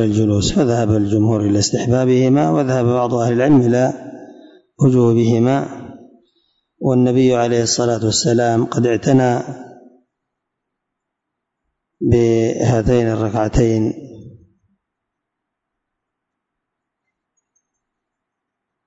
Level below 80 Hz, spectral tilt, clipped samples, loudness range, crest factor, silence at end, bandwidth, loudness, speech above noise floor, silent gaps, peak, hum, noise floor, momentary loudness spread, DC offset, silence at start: -40 dBFS; -6 dB/octave; under 0.1%; 7 LU; 16 dB; 4.55 s; 8 kHz; -15 LUFS; 65 dB; none; -2 dBFS; none; -79 dBFS; 8 LU; under 0.1%; 0 s